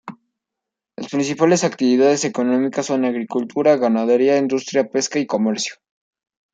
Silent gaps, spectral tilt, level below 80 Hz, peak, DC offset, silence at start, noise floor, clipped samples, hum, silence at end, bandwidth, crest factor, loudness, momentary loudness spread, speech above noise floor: none; -4.5 dB/octave; -68 dBFS; -4 dBFS; under 0.1%; 0.05 s; -84 dBFS; under 0.1%; none; 0.8 s; 9.4 kHz; 16 dB; -18 LUFS; 8 LU; 66 dB